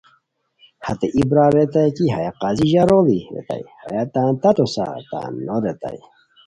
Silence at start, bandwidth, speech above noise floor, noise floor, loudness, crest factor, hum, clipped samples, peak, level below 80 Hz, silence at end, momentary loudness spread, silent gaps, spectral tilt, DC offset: 0.8 s; 11 kHz; 44 dB; -62 dBFS; -19 LUFS; 18 dB; none; under 0.1%; -2 dBFS; -48 dBFS; 0.5 s; 15 LU; none; -7.5 dB/octave; under 0.1%